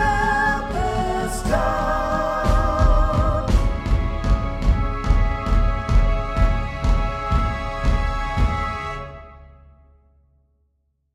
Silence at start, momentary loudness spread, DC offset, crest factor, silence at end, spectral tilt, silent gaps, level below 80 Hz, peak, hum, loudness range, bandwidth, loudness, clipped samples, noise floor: 0 s; 5 LU; under 0.1%; 16 dB; 1.7 s; -6.5 dB/octave; none; -22 dBFS; -4 dBFS; none; 5 LU; 12 kHz; -22 LUFS; under 0.1%; -68 dBFS